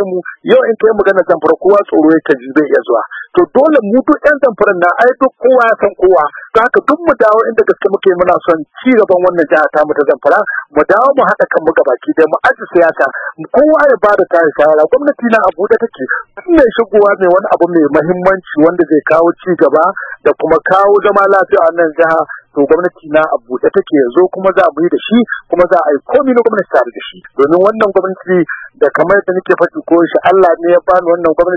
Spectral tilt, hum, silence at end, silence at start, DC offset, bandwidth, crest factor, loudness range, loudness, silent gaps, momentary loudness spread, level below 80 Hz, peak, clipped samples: -7.5 dB/octave; none; 0 s; 0 s; under 0.1%; 7 kHz; 10 dB; 2 LU; -10 LUFS; none; 5 LU; -46 dBFS; 0 dBFS; 0.6%